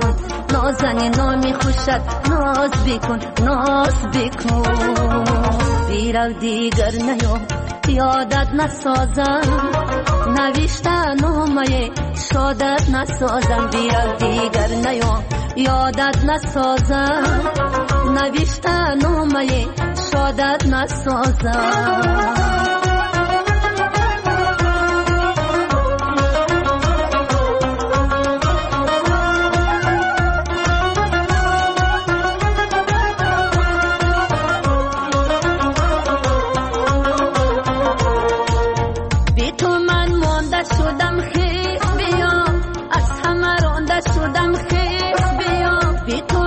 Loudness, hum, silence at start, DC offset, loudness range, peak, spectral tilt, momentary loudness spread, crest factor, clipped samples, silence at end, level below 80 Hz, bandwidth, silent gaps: -17 LUFS; none; 0 s; under 0.1%; 1 LU; -6 dBFS; -5.5 dB/octave; 3 LU; 10 dB; under 0.1%; 0 s; -24 dBFS; 8.8 kHz; none